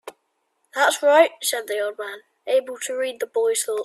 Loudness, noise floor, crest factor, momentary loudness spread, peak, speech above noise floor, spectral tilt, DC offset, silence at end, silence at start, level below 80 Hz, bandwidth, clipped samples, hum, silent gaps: -21 LUFS; -71 dBFS; 18 dB; 17 LU; -4 dBFS; 50 dB; 0.5 dB/octave; under 0.1%; 0 s; 0.05 s; -76 dBFS; 15.5 kHz; under 0.1%; none; none